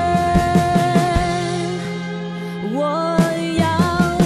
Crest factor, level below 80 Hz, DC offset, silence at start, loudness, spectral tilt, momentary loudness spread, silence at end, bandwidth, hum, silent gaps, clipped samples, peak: 14 dB; -34 dBFS; under 0.1%; 0 s; -19 LUFS; -6 dB/octave; 10 LU; 0 s; 13.5 kHz; none; none; under 0.1%; -4 dBFS